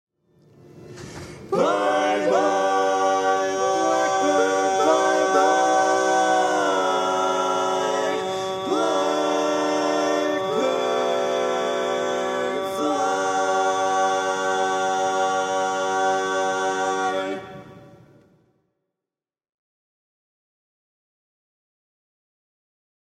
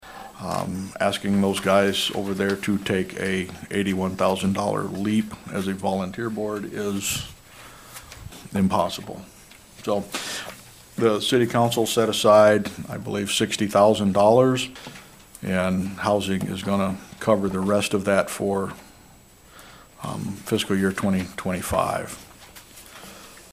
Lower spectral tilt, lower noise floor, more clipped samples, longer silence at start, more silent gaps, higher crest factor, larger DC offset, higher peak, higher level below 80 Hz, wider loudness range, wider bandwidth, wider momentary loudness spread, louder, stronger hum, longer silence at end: second, -3 dB/octave vs -5 dB/octave; first, under -90 dBFS vs -50 dBFS; neither; first, 0.75 s vs 0.05 s; neither; about the same, 18 dB vs 20 dB; neither; about the same, -6 dBFS vs -4 dBFS; second, -66 dBFS vs -54 dBFS; second, 6 LU vs 9 LU; second, 14.5 kHz vs 16 kHz; second, 6 LU vs 22 LU; about the same, -22 LUFS vs -23 LUFS; neither; first, 5.2 s vs 0.1 s